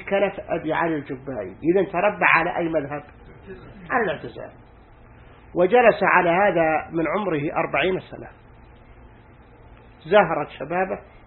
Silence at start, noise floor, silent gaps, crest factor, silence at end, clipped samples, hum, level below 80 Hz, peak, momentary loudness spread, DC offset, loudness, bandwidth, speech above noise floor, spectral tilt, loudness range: 0 s; -48 dBFS; none; 22 dB; 0.25 s; under 0.1%; none; -50 dBFS; 0 dBFS; 20 LU; under 0.1%; -21 LUFS; 4.3 kHz; 27 dB; -10.5 dB/octave; 6 LU